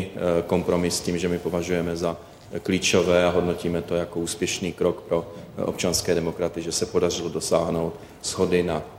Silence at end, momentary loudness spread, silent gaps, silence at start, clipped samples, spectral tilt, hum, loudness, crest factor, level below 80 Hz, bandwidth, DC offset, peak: 0 s; 9 LU; none; 0 s; under 0.1%; -4.5 dB/octave; none; -24 LUFS; 18 dB; -48 dBFS; 16.5 kHz; under 0.1%; -6 dBFS